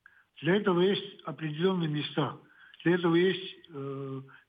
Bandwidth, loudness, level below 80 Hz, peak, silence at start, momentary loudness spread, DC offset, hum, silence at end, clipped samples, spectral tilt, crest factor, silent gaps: 5 kHz; -30 LUFS; -82 dBFS; -14 dBFS; 0.4 s; 15 LU; under 0.1%; none; 0.2 s; under 0.1%; -9 dB/octave; 16 dB; none